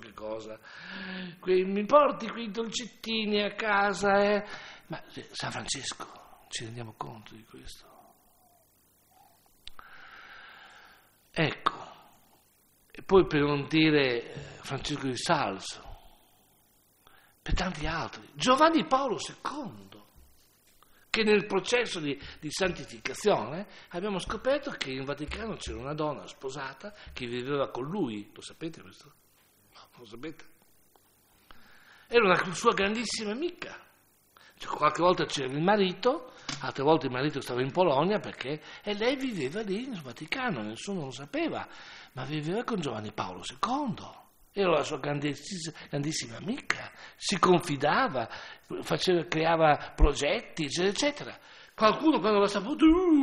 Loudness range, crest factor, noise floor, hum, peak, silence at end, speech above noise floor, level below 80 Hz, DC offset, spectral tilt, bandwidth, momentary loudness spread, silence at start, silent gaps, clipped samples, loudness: 10 LU; 24 dB; -65 dBFS; none; -6 dBFS; 0 s; 36 dB; -46 dBFS; under 0.1%; -4.5 dB/octave; 15.5 kHz; 19 LU; 0 s; none; under 0.1%; -29 LUFS